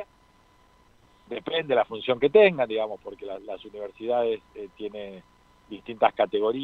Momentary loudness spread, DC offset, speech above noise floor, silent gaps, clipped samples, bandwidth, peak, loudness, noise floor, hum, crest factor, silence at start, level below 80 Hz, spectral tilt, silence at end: 20 LU; under 0.1%; 34 dB; none; under 0.1%; 4.6 kHz; -4 dBFS; -25 LUFS; -59 dBFS; none; 22 dB; 0 s; -64 dBFS; -7 dB/octave; 0 s